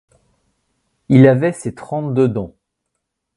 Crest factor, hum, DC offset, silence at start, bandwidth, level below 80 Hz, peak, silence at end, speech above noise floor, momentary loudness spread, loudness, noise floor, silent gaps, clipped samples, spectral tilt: 18 dB; none; under 0.1%; 1.1 s; 11.5 kHz; -52 dBFS; 0 dBFS; 0.9 s; 61 dB; 16 LU; -15 LUFS; -76 dBFS; none; under 0.1%; -8.5 dB/octave